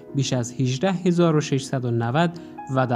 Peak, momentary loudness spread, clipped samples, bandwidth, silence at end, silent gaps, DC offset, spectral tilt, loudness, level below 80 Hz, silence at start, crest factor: -6 dBFS; 6 LU; under 0.1%; 11 kHz; 0 s; none; under 0.1%; -6 dB/octave; -23 LUFS; -62 dBFS; 0 s; 16 dB